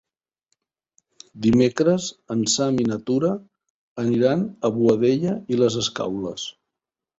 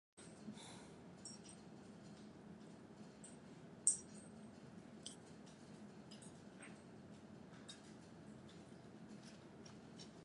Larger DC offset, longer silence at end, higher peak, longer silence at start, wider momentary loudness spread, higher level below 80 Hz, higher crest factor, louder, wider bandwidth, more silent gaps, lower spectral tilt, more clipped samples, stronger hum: neither; first, 0.65 s vs 0 s; first, -4 dBFS vs -16 dBFS; first, 1.35 s vs 0.15 s; first, 10 LU vs 6 LU; first, -56 dBFS vs -80 dBFS; second, 18 dB vs 38 dB; first, -22 LUFS vs -51 LUFS; second, 8 kHz vs 11 kHz; first, 3.70-3.96 s vs none; first, -5 dB/octave vs -3 dB/octave; neither; neither